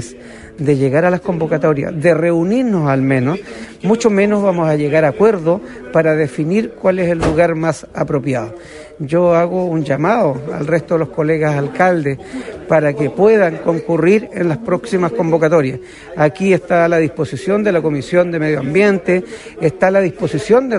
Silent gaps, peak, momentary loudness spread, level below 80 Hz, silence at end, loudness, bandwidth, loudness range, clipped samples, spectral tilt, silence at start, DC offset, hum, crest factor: none; 0 dBFS; 9 LU; -44 dBFS; 0 s; -15 LUFS; 11.5 kHz; 2 LU; under 0.1%; -7.5 dB/octave; 0 s; under 0.1%; none; 14 dB